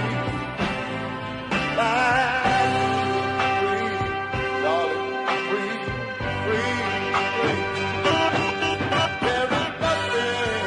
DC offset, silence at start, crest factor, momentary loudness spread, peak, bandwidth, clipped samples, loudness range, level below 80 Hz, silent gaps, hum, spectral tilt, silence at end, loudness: under 0.1%; 0 s; 16 dB; 7 LU; -8 dBFS; 11 kHz; under 0.1%; 2 LU; -48 dBFS; none; none; -4.5 dB/octave; 0 s; -23 LUFS